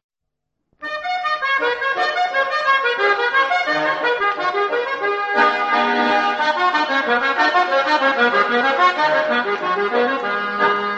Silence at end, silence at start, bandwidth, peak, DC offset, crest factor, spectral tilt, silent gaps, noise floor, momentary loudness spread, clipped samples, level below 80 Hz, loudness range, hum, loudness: 0 s; 0.8 s; 8.4 kHz; -2 dBFS; under 0.1%; 16 dB; -3 dB/octave; none; -79 dBFS; 5 LU; under 0.1%; -66 dBFS; 2 LU; none; -17 LUFS